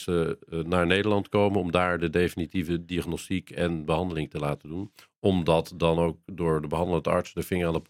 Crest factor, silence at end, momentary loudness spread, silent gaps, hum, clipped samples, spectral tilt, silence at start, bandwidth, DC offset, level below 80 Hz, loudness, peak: 22 dB; 0.05 s; 8 LU; 5.18-5.22 s; none; under 0.1%; -6.5 dB/octave; 0 s; 16 kHz; under 0.1%; -52 dBFS; -27 LUFS; -6 dBFS